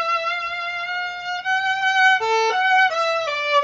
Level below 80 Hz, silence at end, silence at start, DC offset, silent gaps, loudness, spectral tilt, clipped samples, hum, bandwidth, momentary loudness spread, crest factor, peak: -64 dBFS; 0 s; 0 s; under 0.1%; none; -19 LUFS; 1 dB/octave; under 0.1%; none; 8 kHz; 9 LU; 14 dB; -6 dBFS